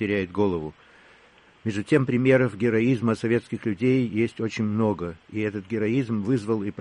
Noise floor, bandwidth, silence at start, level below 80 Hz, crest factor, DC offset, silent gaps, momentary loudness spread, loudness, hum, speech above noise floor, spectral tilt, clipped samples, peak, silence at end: -55 dBFS; 10.5 kHz; 0 s; -58 dBFS; 18 dB; under 0.1%; none; 10 LU; -25 LUFS; none; 31 dB; -7.5 dB/octave; under 0.1%; -8 dBFS; 0 s